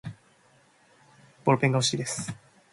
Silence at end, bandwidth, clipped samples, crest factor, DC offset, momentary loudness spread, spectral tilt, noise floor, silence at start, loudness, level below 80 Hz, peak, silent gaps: 0.4 s; 11.5 kHz; under 0.1%; 22 dB; under 0.1%; 19 LU; -4.5 dB/octave; -61 dBFS; 0.05 s; -26 LUFS; -66 dBFS; -8 dBFS; none